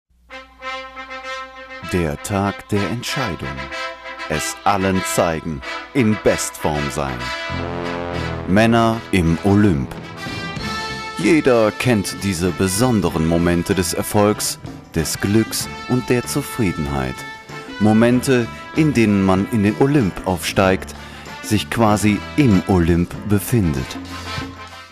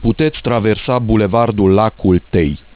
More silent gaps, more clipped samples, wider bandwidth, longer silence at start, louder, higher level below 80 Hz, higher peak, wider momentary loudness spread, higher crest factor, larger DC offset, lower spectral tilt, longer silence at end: neither; neither; first, 15.5 kHz vs 4 kHz; first, 0.3 s vs 0 s; second, -19 LUFS vs -14 LUFS; second, -38 dBFS vs -30 dBFS; about the same, -4 dBFS vs -2 dBFS; first, 14 LU vs 4 LU; about the same, 14 dB vs 12 dB; second, under 0.1% vs 0.4%; second, -5.5 dB/octave vs -11.5 dB/octave; second, 0.05 s vs 0.2 s